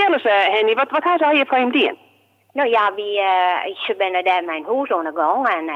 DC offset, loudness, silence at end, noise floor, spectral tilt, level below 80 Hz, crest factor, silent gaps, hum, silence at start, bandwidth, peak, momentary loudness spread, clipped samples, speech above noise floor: under 0.1%; -18 LUFS; 0 s; -57 dBFS; -4 dB/octave; -90 dBFS; 12 dB; none; none; 0 s; 7 kHz; -6 dBFS; 7 LU; under 0.1%; 39 dB